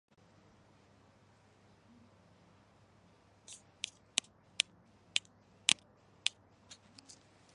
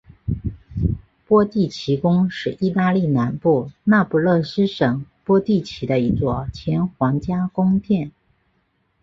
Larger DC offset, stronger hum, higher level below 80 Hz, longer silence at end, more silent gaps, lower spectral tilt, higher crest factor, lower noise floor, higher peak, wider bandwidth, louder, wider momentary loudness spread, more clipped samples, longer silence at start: neither; neither; second, -78 dBFS vs -40 dBFS; first, 1.8 s vs 0.95 s; neither; second, 1 dB/octave vs -8.5 dB/octave; first, 40 dB vs 18 dB; about the same, -66 dBFS vs -66 dBFS; about the same, -4 dBFS vs -2 dBFS; first, 11.5 kHz vs 7.4 kHz; second, -36 LUFS vs -20 LUFS; first, 26 LU vs 8 LU; neither; first, 3.5 s vs 0.25 s